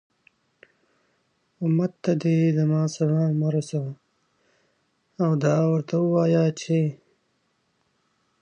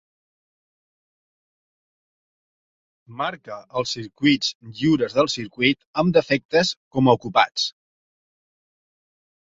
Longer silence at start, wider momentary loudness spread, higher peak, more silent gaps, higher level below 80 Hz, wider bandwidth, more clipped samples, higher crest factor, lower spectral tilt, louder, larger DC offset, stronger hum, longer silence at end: second, 1.6 s vs 3.1 s; about the same, 9 LU vs 10 LU; second, -8 dBFS vs -2 dBFS; second, none vs 4.55-4.60 s, 5.87-5.93 s, 6.45-6.49 s, 6.77-6.91 s; second, -74 dBFS vs -60 dBFS; first, 9.2 kHz vs 7.8 kHz; neither; second, 16 dB vs 22 dB; first, -8 dB/octave vs -5 dB/octave; about the same, -23 LUFS vs -21 LUFS; neither; neither; second, 1.45 s vs 1.85 s